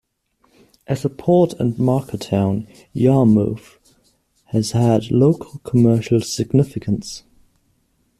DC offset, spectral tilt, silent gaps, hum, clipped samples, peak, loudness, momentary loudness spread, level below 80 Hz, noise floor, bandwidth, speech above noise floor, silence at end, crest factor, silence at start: under 0.1%; -7.5 dB/octave; none; none; under 0.1%; -2 dBFS; -18 LUFS; 10 LU; -50 dBFS; -63 dBFS; 14 kHz; 46 dB; 1 s; 16 dB; 0.9 s